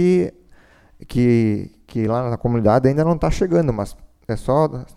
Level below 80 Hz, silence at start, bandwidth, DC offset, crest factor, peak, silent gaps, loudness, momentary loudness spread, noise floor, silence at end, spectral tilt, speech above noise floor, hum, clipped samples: -36 dBFS; 0 s; 13 kHz; under 0.1%; 16 dB; -2 dBFS; none; -19 LUFS; 11 LU; -50 dBFS; 0.15 s; -8.5 dB/octave; 32 dB; none; under 0.1%